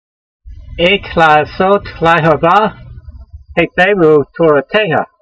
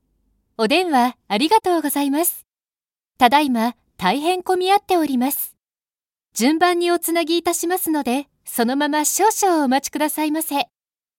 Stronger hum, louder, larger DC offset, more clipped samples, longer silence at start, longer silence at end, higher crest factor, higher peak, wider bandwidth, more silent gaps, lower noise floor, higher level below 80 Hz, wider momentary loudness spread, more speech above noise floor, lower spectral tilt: neither; first, -11 LUFS vs -19 LUFS; neither; first, 0.1% vs under 0.1%; second, 0.45 s vs 0.6 s; second, 0.15 s vs 0.55 s; second, 12 dB vs 18 dB; about the same, 0 dBFS vs 0 dBFS; second, 8.2 kHz vs 17 kHz; neither; second, -33 dBFS vs under -90 dBFS; first, -36 dBFS vs -62 dBFS; about the same, 6 LU vs 8 LU; second, 22 dB vs over 72 dB; first, -6.5 dB/octave vs -2.5 dB/octave